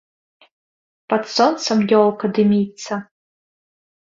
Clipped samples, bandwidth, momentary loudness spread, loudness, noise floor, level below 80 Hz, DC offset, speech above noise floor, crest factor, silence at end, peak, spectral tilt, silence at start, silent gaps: under 0.1%; 7.6 kHz; 12 LU; -18 LUFS; under -90 dBFS; -64 dBFS; under 0.1%; over 73 dB; 18 dB; 1.15 s; -2 dBFS; -5.5 dB/octave; 1.1 s; none